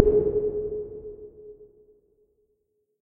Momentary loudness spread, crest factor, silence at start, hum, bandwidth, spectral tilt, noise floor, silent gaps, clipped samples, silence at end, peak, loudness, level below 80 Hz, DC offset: 24 LU; 28 dB; 0 s; none; 1.8 kHz; -13 dB/octave; -74 dBFS; none; under 0.1%; 1.35 s; 0 dBFS; -27 LUFS; -44 dBFS; under 0.1%